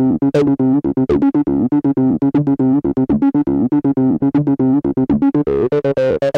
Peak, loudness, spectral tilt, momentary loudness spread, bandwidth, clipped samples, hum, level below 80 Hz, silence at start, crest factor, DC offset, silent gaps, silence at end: -4 dBFS; -15 LUFS; -9.5 dB/octave; 2 LU; 5.8 kHz; under 0.1%; none; -42 dBFS; 0 s; 10 dB; under 0.1%; none; 0 s